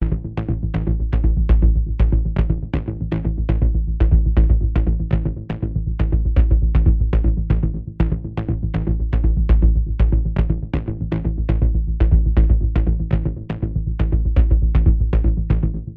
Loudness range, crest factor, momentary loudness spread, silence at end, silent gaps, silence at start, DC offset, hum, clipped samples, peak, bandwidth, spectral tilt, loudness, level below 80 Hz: 1 LU; 14 dB; 8 LU; 0 s; none; 0 s; under 0.1%; none; under 0.1%; -2 dBFS; 3.5 kHz; -11 dB/octave; -20 LUFS; -18 dBFS